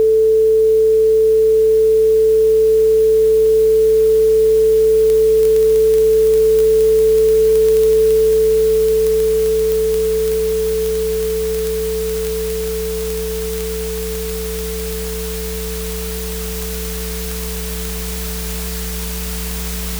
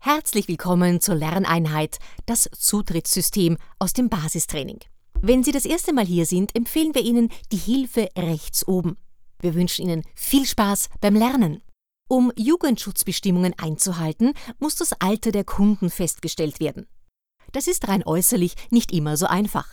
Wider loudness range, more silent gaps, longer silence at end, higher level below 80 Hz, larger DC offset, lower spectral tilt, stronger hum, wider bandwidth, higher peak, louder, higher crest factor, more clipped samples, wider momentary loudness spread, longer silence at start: first, 11 LU vs 2 LU; neither; about the same, 0 s vs 0 s; first, -30 dBFS vs -40 dBFS; neither; about the same, -4.5 dB/octave vs -4.5 dB/octave; neither; about the same, over 20 kHz vs over 20 kHz; first, 0 dBFS vs -4 dBFS; first, -15 LUFS vs -21 LUFS; about the same, 14 dB vs 18 dB; neither; first, 11 LU vs 7 LU; about the same, 0 s vs 0.05 s